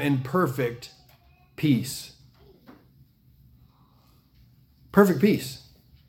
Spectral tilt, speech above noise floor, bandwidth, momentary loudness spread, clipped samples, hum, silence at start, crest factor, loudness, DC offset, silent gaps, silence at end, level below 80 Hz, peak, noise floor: -6.5 dB/octave; 36 dB; 17 kHz; 24 LU; under 0.1%; none; 0 s; 24 dB; -24 LUFS; under 0.1%; none; 0.5 s; -60 dBFS; -4 dBFS; -59 dBFS